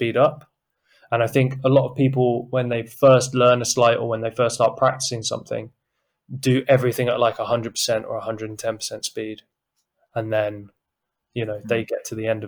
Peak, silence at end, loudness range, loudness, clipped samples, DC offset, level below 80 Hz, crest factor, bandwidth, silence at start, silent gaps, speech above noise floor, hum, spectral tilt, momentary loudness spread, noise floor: -6 dBFS; 0 s; 10 LU; -21 LUFS; under 0.1%; under 0.1%; -62 dBFS; 16 dB; over 20 kHz; 0 s; none; 60 dB; none; -5 dB/octave; 13 LU; -81 dBFS